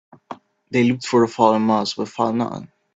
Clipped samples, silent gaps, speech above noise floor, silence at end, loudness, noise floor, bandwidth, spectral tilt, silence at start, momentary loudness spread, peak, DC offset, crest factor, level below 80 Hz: under 0.1%; none; 21 dB; 0.3 s; -19 LUFS; -40 dBFS; 8 kHz; -6 dB/octave; 0.3 s; 23 LU; -2 dBFS; under 0.1%; 20 dB; -62 dBFS